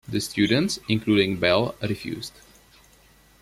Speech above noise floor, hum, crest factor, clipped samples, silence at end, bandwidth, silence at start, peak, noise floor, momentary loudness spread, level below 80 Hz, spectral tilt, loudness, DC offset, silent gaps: 32 dB; none; 20 dB; under 0.1%; 1.15 s; 15.5 kHz; 0.1 s; -6 dBFS; -56 dBFS; 12 LU; -56 dBFS; -5 dB/octave; -23 LUFS; under 0.1%; none